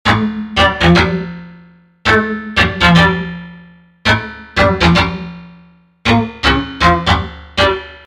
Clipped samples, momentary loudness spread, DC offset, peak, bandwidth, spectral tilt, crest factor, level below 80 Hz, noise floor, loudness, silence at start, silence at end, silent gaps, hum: under 0.1%; 12 LU; under 0.1%; 0 dBFS; 11 kHz; -5.5 dB/octave; 14 dB; -28 dBFS; -45 dBFS; -13 LUFS; 0.05 s; 0.1 s; none; none